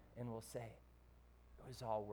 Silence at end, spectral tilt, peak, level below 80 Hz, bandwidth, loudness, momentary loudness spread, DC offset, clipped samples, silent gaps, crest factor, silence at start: 0 s; -6 dB/octave; -30 dBFS; -66 dBFS; over 20 kHz; -50 LUFS; 23 LU; under 0.1%; under 0.1%; none; 20 dB; 0 s